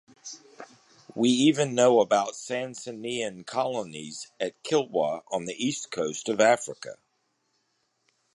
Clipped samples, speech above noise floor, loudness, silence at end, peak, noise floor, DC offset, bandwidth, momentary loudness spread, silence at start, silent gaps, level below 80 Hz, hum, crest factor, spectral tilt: under 0.1%; 48 dB; -26 LUFS; 1.4 s; -6 dBFS; -74 dBFS; under 0.1%; 11.5 kHz; 19 LU; 0.25 s; none; -74 dBFS; none; 20 dB; -4 dB/octave